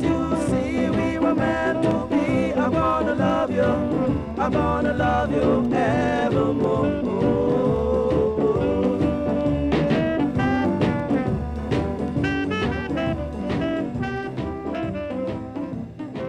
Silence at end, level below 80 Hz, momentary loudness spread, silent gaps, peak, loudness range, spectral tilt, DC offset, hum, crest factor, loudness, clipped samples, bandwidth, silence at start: 0 s; -38 dBFS; 7 LU; none; -10 dBFS; 5 LU; -7.5 dB/octave; under 0.1%; none; 12 dB; -22 LUFS; under 0.1%; 11 kHz; 0 s